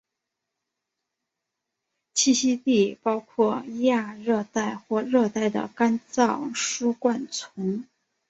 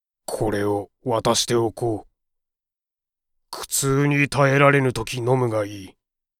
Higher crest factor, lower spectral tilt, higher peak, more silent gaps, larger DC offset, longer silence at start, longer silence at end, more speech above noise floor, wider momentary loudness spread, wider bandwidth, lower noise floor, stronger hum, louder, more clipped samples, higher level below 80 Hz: about the same, 18 dB vs 20 dB; about the same, -3.5 dB/octave vs -4.5 dB/octave; second, -8 dBFS vs -2 dBFS; neither; neither; first, 2.15 s vs 0.3 s; about the same, 0.45 s vs 0.5 s; second, 60 dB vs 68 dB; second, 8 LU vs 16 LU; second, 8.4 kHz vs 16.5 kHz; second, -84 dBFS vs -89 dBFS; neither; second, -25 LUFS vs -21 LUFS; neither; second, -70 dBFS vs -48 dBFS